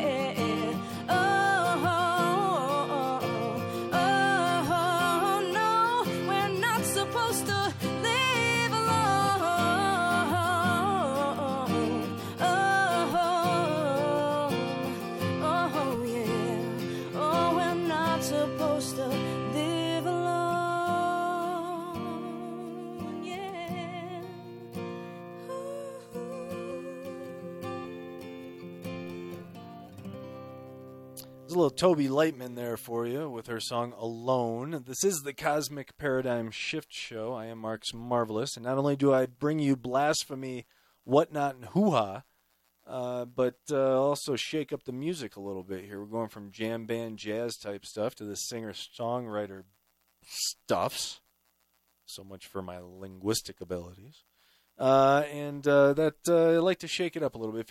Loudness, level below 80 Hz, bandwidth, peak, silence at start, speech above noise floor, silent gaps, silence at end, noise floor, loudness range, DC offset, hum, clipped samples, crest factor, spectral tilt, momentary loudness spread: -29 LUFS; -68 dBFS; 17 kHz; -10 dBFS; 0 s; 43 dB; none; 0.05 s; -73 dBFS; 13 LU; under 0.1%; none; under 0.1%; 20 dB; -4.5 dB/octave; 16 LU